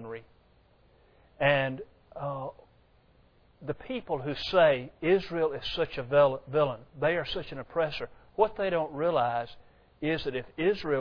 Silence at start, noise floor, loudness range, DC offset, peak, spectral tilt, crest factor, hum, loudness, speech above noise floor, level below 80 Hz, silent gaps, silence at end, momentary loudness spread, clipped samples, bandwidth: 0 s; -62 dBFS; 7 LU; under 0.1%; -10 dBFS; -7 dB/octave; 20 dB; none; -29 LUFS; 34 dB; -56 dBFS; none; 0 s; 15 LU; under 0.1%; 5.4 kHz